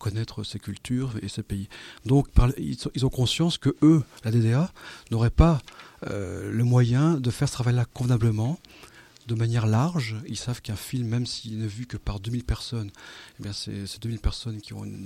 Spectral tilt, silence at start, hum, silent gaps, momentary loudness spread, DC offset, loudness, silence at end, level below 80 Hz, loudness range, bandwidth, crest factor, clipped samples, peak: -6.5 dB/octave; 0 s; none; none; 15 LU; under 0.1%; -26 LUFS; 0 s; -36 dBFS; 8 LU; 14.5 kHz; 22 dB; under 0.1%; -2 dBFS